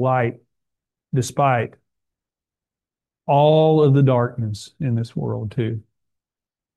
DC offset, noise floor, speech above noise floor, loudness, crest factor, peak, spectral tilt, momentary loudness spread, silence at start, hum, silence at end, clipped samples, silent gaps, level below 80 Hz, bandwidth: under 0.1%; under -90 dBFS; over 72 dB; -19 LUFS; 16 dB; -4 dBFS; -7.5 dB/octave; 13 LU; 0 s; none; 0.95 s; under 0.1%; none; -60 dBFS; 12 kHz